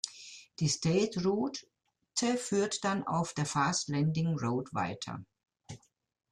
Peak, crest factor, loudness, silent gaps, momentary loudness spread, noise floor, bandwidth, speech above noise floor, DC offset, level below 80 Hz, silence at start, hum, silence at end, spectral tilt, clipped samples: -12 dBFS; 22 dB; -32 LUFS; none; 17 LU; -58 dBFS; 11.5 kHz; 26 dB; under 0.1%; -66 dBFS; 0.05 s; none; 0.55 s; -4.5 dB/octave; under 0.1%